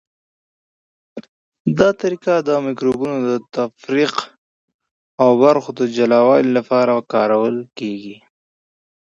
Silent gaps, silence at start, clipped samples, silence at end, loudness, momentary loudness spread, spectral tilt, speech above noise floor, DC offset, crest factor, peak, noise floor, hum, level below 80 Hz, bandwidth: 1.28-1.52 s, 1.60-1.65 s, 4.38-4.68 s, 4.74-4.79 s, 4.91-5.18 s; 1.15 s; under 0.1%; 0.9 s; -17 LUFS; 16 LU; -6.5 dB/octave; over 74 dB; under 0.1%; 18 dB; 0 dBFS; under -90 dBFS; none; -60 dBFS; 7.8 kHz